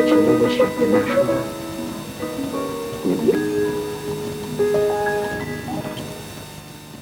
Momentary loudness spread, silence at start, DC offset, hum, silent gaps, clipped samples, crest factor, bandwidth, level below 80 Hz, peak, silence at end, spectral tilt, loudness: 14 LU; 0 s; under 0.1%; none; none; under 0.1%; 16 dB; 20 kHz; -48 dBFS; -4 dBFS; 0 s; -5.5 dB/octave; -21 LUFS